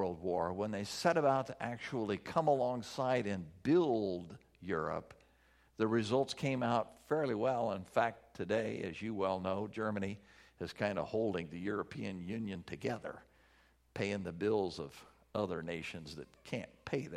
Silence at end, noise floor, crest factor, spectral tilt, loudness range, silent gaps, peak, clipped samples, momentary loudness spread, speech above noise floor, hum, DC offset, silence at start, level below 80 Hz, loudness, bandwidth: 0 s; -69 dBFS; 20 dB; -6 dB/octave; 5 LU; none; -16 dBFS; under 0.1%; 12 LU; 32 dB; none; under 0.1%; 0 s; -68 dBFS; -37 LUFS; 14.5 kHz